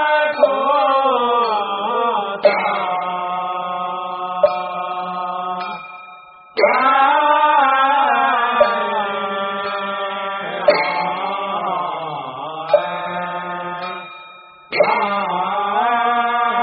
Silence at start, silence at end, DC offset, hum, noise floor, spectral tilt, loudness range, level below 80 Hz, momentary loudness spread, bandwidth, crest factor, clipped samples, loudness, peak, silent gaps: 0 s; 0 s; under 0.1%; none; -41 dBFS; -1 dB/octave; 7 LU; -66 dBFS; 12 LU; 5 kHz; 18 dB; under 0.1%; -18 LUFS; 0 dBFS; none